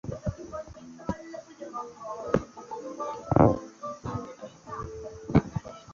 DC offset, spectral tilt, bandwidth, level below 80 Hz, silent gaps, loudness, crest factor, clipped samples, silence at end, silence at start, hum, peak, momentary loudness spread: under 0.1%; -8 dB/octave; 7.6 kHz; -46 dBFS; none; -31 LUFS; 26 dB; under 0.1%; 0 s; 0.05 s; none; -6 dBFS; 18 LU